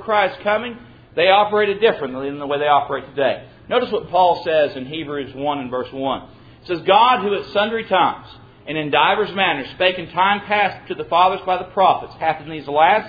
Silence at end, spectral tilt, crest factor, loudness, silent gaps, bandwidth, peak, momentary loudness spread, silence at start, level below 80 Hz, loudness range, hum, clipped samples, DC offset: 0 s; -7 dB/octave; 18 dB; -18 LUFS; none; 5 kHz; 0 dBFS; 11 LU; 0 s; -54 dBFS; 3 LU; none; under 0.1%; under 0.1%